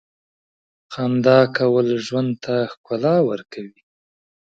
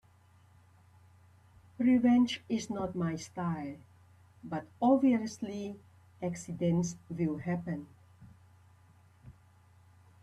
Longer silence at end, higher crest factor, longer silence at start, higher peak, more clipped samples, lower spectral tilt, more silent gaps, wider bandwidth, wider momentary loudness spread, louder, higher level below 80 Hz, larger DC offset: second, 0.75 s vs 0.9 s; about the same, 20 dB vs 20 dB; second, 0.9 s vs 1.8 s; first, 0 dBFS vs -14 dBFS; neither; about the same, -7 dB/octave vs -6.5 dB/octave; first, 2.77-2.84 s vs none; second, 7.8 kHz vs 11 kHz; first, 21 LU vs 15 LU; first, -19 LUFS vs -32 LUFS; about the same, -66 dBFS vs -68 dBFS; neither